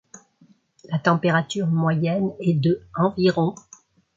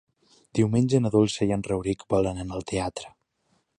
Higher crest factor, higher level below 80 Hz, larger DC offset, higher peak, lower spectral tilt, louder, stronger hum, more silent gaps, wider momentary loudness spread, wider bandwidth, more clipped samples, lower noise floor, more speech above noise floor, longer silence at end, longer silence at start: about the same, 18 dB vs 18 dB; second, -60 dBFS vs -48 dBFS; neither; first, -4 dBFS vs -8 dBFS; about the same, -7 dB/octave vs -6.5 dB/octave; first, -22 LUFS vs -25 LUFS; neither; neither; second, 4 LU vs 12 LU; second, 7.6 kHz vs 10.5 kHz; neither; second, -58 dBFS vs -71 dBFS; second, 37 dB vs 46 dB; about the same, 0.6 s vs 0.7 s; second, 0.15 s vs 0.55 s